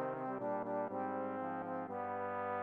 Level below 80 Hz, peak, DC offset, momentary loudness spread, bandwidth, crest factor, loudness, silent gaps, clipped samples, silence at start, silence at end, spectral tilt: -86 dBFS; -26 dBFS; under 0.1%; 2 LU; 4.3 kHz; 14 dB; -41 LUFS; none; under 0.1%; 0 s; 0 s; -9.5 dB/octave